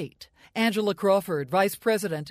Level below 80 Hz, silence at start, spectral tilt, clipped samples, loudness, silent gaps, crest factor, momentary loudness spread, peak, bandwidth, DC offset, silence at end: -68 dBFS; 0 s; -5 dB/octave; under 0.1%; -25 LUFS; none; 16 dB; 6 LU; -10 dBFS; 15.5 kHz; under 0.1%; 0 s